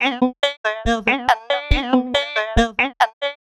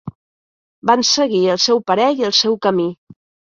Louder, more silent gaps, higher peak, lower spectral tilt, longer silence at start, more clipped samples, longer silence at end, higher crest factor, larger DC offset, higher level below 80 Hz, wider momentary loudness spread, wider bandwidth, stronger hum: second, -19 LUFS vs -15 LUFS; second, 0.57-0.64 s, 3.13-3.21 s vs 0.15-0.82 s; about the same, 0 dBFS vs -2 dBFS; first, -4.5 dB/octave vs -3 dB/octave; about the same, 0 s vs 0.05 s; neither; second, 0.05 s vs 0.55 s; about the same, 20 dB vs 16 dB; neither; first, -30 dBFS vs -60 dBFS; second, 3 LU vs 8 LU; first, 13 kHz vs 7.6 kHz; neither